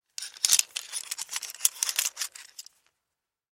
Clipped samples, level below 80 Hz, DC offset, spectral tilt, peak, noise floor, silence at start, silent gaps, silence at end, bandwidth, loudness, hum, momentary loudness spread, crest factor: under 0.1%; -90 dBFS; under 0.1%; 5.5 dB/octave; -2 dBFS; -86 dBFS; 0.2 s; none; 0.95 s; 17 kHz; -27 LUFS; none; 19 LU; 30 dB